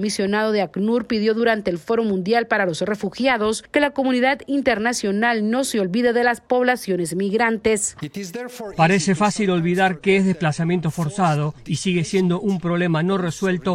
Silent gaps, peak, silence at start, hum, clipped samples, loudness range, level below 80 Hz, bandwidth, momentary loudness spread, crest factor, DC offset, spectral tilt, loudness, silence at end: none; -4 dBFS; 0 s; none; under 0.1%; 1 LU; -54 dBFS; 14.5 kHz; 5 LU; 16 dB; under 0.1%; -5 dB/octave; -20 LUFS; 0 s